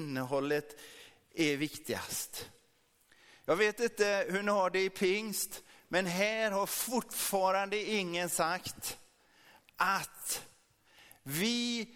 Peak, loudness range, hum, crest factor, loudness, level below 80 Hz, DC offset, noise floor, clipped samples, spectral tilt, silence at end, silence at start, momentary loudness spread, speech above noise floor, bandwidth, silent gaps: -16 dBFS; 5 LU; none; 20 dB; -33 LUFS; -70 dBFS; under 0.1%; -70 dBFS; under 0.1%; -3 dB/octave; 0 s; 0 s; 12 LU; 37 dB; 18 kHz; none